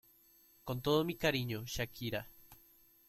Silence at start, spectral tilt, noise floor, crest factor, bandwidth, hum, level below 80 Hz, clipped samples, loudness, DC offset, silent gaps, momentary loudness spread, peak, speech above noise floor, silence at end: 0.65 s; -5 dB/octave; -66 dBFS; 20 dB; 16.5 kHz; none; -60 dBFS; under 0.1%; -36 LUFS; under 0.1%; none; 11 LU; -18 dBFS; 30 dB; 0.55 s